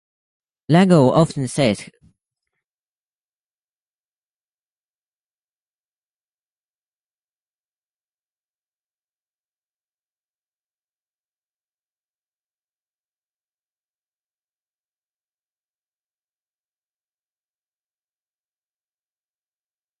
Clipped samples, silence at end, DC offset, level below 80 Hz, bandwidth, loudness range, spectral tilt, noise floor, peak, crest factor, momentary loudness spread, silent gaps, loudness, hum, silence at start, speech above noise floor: under 0.1%; 18.15 s; under 0.1%; -62 dBFS; 11.5 kHz; 9 LU; -6.5 dB/octave; under -90 dBFS; -2 dBFS; 26 dB; 7 LU; none; -16 LUFS; none; 0.7 s; over 75 dB